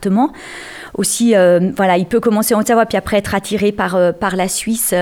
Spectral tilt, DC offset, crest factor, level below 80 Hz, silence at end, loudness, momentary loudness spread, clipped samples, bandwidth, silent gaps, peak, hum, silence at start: -4.5 dB/octave; under 0.1%; 12 dB; -44 dBFS; 0 s; -14 LUFS; 8 LU; under 0.1%; 19 kHz; none; -2 dBFS; none; 0 s